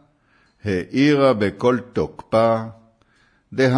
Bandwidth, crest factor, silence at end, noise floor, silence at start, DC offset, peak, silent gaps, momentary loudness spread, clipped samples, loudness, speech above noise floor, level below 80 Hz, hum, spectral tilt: 10.5 kHz; 16 dB; 0 s; -60 dBFS; 0.65 s; under 0.1%; -4 dBFS; none; 13 LU; under 0.1%; -19 LUFS; 41 dB; -54 dBFS; none; -7 dB/octave